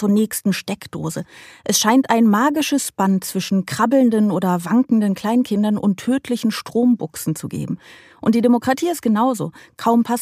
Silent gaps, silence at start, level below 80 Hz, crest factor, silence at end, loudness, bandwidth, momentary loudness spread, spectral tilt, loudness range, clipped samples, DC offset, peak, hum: none; 0 s; -60 dBFS; 18 dB; 0 s; -18 LUFS; 15.5 kHz; 12 LU; -5 dB/octave; 3 LU; under 0.1%; under 0.1%; 0 dBFS; none